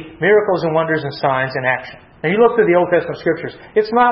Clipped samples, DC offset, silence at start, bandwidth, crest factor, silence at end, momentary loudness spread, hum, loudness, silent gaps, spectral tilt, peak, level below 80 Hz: under 0.1%; under 0.1%; 0 s; 6 kHz; 16 dB; 0 s; 8 LU; none; -16 LUFS; none; -9 dB/octave; 0 dBFS; -54 dBFS